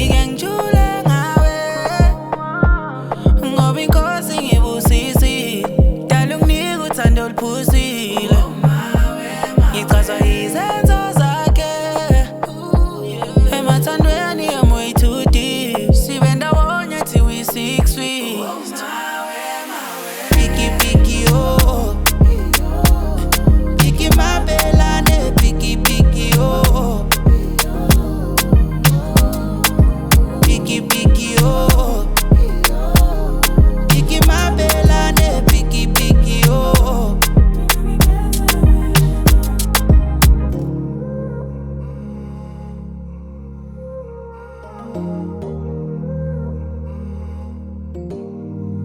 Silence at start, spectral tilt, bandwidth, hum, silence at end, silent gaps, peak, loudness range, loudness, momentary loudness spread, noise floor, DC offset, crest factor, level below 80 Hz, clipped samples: 0 s; -5 dB/octave; over 20 kHz; none; 0 s; none; 0 dBFS; 12 LU; -15 LUFS; 14 LU; -34 dBFS; under 0.1%; 14 dB; -16 dBFS; under 0.1%